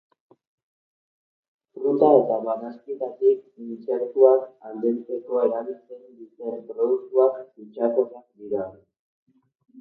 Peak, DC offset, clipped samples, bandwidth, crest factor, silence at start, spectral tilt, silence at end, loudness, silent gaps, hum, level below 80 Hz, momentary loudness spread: -2 dBFS; under 0.1%; under 0.1%; 4 kHz; 22 dB; 1.75 s; -11 dB/octave; 0 s; -23 LUFS; 8.99-9.26 s; none; -76 dBFS; 19 LU